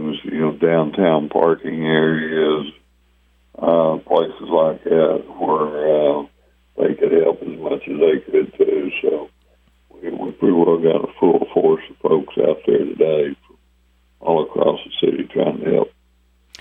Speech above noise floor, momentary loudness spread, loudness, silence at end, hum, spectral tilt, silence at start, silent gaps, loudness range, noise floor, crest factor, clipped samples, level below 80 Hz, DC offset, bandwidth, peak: 40 dB; 9 LU; -18 LUFS; 0.7 s; 60 Hz at -55 dBFS; -8.5 dB/octave; 0 s; none; 3 LU; -57 dBFS; 18 dB; under 0.1%; -56 dBFS; under 0.1%; 5.2 kHz; -2 dBFS